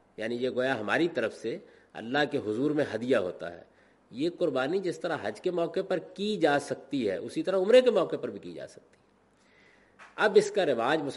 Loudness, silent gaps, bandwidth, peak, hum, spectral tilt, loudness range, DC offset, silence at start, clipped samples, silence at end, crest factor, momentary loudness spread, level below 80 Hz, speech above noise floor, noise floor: -28 LUFS; none; 11.5 kHz; -10 dBFS; none; -5 dB/octave; 4 LU; under 0.1%; 0.2 s; under 0.1%; 0 s; 20 dB; 18 LU; -74 dBFS; 36 dB; -64 dBFS